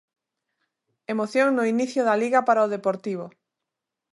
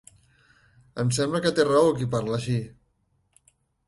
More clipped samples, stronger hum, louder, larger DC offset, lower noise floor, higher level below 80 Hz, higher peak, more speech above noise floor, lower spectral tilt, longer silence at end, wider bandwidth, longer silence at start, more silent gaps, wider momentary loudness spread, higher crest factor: neither; neither; about the same, -23 LUFS vs -24 LUFS; neither; first, -85 dBFS vs -70 dBFS; second, -80 dBFS vs -58 dBFS; about the same, -8 dBFS vs -6 dBFS; first, 63 dB vs 46 dB; about the same, -5.5 dB/octave vs -5.5 dB/octave; second, 0.85 s vs 1.15 s; about the same, 11.5 kHz vs 11.5 kHz; first, 1.1 s vs 0.95 s; neither; first, 13 LU vs 10 LU; about the same, 18 dB vs 20 dB